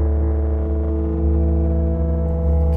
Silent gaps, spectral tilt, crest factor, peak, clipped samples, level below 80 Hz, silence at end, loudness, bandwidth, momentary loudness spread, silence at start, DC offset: none; -12.5 dB/octave; 10 dB; -8 dBFS; under 0.1%; -18 dBFS; 0 s; -20 LUFS; 2.1 kHz; 3 LU; 0 s; under 0.1%